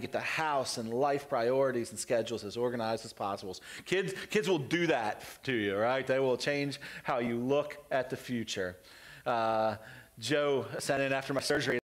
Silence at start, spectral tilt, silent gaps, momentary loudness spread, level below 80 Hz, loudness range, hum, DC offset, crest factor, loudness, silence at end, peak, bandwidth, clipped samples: 0 s; -4.5 dB/octave; none; 9 LU; -68 dBFS; 2 LU; none; under 0.1%; 14 dB; -32 LUFS; 0.2 s; -18 dBFS; 16 kHz; under 0.1%